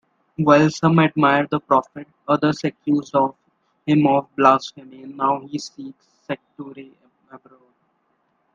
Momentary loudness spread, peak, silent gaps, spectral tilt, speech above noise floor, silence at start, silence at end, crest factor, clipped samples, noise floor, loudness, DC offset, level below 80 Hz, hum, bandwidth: 22 LU; 0 dBFS; none; -6.5 dB/octave; 48 dB; 0.4 s; 1.15 s; 20 dB; under 0.1%; -67 dBFS; -19 LUFS; under 0.1%; -62 dBFS; none; 7.6 kHz